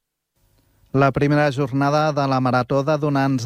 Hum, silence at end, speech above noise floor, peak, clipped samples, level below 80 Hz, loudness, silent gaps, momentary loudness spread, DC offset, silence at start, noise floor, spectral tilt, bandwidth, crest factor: none; 0 s; 48 dB; -6 dBFS; under 0.1%; -52 dBFS; -19 LUFS; none; 3 LU; under 0.1%; 0.95 s; -67 dBFS; -7 dB/octave; 10.5 kHz; 14 dB